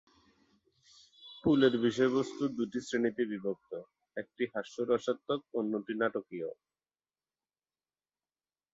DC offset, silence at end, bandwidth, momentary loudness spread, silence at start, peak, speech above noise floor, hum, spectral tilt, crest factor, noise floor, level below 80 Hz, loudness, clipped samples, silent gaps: under 0.1%; 2.2 s; 8 kHz; 17 LU; 1.2 s; -14 dBFS; over 58 dB; none; -6 dB/octave; 22 dB; under -90 dBFS; -70 dBFS; -33 LUFS; under 0.1%; none